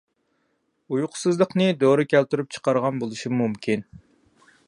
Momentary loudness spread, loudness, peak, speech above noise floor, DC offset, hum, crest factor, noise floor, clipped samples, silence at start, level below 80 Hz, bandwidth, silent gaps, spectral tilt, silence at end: 8 LU; -23 LUFS; -6 dBFS; 49 dB; under 0.1%; none; 18 dB; -71 dBFS; under 0.1%; 0.9 s; -66 dBFS; 11.5 kHz; none; -6 dB/octave; 0.7 s